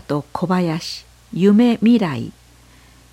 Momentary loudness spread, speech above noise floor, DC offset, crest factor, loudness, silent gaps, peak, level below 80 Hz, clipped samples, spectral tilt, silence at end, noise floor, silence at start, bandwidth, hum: 17 LU; 31 dB; under 0.1%; 14 dB; -17 LUFS; none; -4 dBFS; -52 dBFS; under 0.1%; -7 dB/octave; 0.8 s; -48 dBFS; 0.1 s; 12.5 kHz; none